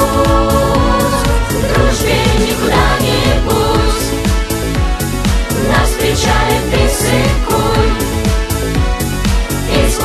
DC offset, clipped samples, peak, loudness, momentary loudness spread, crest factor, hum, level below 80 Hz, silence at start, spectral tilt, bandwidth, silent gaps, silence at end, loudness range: under 0.1%; under 0.1%; 0 dBFS; -13 LUFS; 4 LU; 12 dB; none; -18 dBFS; 0 s; -4.5 dB/octave; 14.5 kHz; none; 0 s; 2 LU